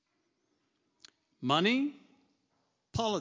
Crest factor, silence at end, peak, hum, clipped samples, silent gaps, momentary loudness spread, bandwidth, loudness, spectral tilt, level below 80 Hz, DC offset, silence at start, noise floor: 22 dB; 0 s; -14 dBFS; none; under 0.1%; none; 13 LU; 7.6 kHz; -31 LUFS; -5 dB/octave; -62 dBFS; under 0.1%; 1.4 s; -79 dBFS